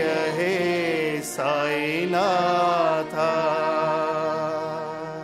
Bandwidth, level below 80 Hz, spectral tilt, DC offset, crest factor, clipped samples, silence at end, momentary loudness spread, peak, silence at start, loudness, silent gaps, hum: 16 kHz; -64 dBFS; -4.5 dB/octave; under 0.1%; 14 dB; under 0.1%; 0 s; 6 LU; -10 dBFS; 0 s; -23 LUFS; none; none